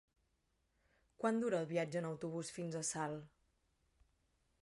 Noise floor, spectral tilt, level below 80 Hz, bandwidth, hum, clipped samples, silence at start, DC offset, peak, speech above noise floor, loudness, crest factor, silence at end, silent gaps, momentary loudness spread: -82 dBFS; -5 dB/octave; -78 dBFS; 11.5 kHz; none; under 0.1%; 1.2 s; under 0.1%; -22 dBFS; 41 dB; -41 LUFS; 20 dB; 1.35 s; none; 7 LU